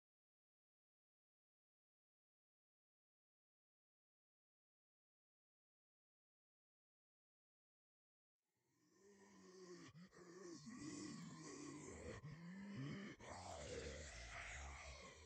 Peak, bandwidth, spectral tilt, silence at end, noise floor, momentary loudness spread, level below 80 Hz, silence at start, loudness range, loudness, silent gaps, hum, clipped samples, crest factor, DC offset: -40 dBFS; 8.8 kHz; -4.5 dB/octave; 0 s; -85 dBFS; 10 LU; -70 dBFS; 8.85 s; 13 LU; -56 LUFS; none; none; under 0.1%; 20 dB; under 0.1%